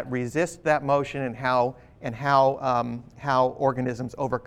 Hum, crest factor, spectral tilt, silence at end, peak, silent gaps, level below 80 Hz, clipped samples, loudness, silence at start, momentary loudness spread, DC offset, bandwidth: none; 18 dB; -6 dB/octave; 0 s; -8 dBFS; none; -56 dBFS; under 0.1%; -25 LUFS; 0 s; 10 LU; under 0.1%; 13.5 kHz